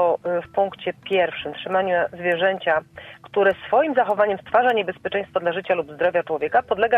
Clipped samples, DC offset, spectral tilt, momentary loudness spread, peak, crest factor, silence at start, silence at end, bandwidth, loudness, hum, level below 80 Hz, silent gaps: under 0.1%; under 0.1%; -6.5 dB/octave; 6 LU; -6 dBFS; 16 dB; 0 s; 0 s; 5.2 kHz; -22 LUFS; none; -60 dBFS; none